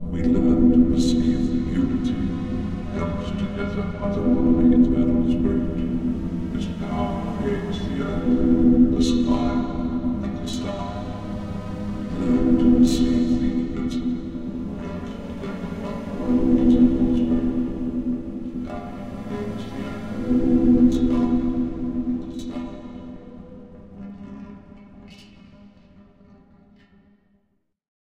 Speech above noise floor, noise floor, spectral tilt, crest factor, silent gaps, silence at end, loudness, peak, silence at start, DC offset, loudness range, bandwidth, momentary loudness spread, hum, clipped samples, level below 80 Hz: 51 dB; -70 dBFS; -7.5 dB/octave; 16 dB; none; 1.65 s; -22 LUFS; -6 dBFS; 0 s; 0.4%; 7 LU; 9 kHz; 15 LU; none; under 0.1%; -34 dBFS